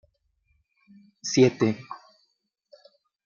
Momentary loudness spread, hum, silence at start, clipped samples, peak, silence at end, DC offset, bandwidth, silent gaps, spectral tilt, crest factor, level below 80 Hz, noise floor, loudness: 23 LU; none; 1.25 s; under 0.1%; -6 dBFS; 1.3 s; under 0.1%; 7.4 kHz; none; -5.5 dB/octave; 22 dB; -72 dBFS; -74 dBFS; -24 LUFS